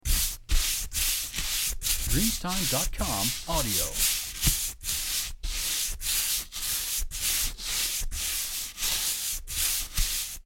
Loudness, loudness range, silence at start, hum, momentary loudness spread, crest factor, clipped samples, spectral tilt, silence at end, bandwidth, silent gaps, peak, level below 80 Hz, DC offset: -27 LUFS; 2 LU; 0.05 s; none; 4 LU; 20 dB; under 0.1%; -1.5 dB/octave; 0.05 s; 17 kHz; none; -8 dBFS; -34 dBFS; under 0.1%